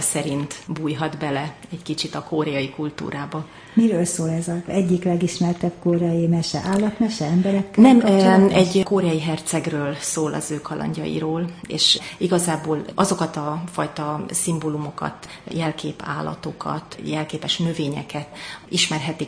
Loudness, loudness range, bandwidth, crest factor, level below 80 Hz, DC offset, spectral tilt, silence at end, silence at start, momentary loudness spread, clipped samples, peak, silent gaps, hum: -21 LUFS; 9 LU; 10.5 kHz; 20 dB; -54 dBFS; under 0.1%; -5 dB/octave; 0 s; 0 s; 13 LU; under 0.1%; -2 dBFS; none; none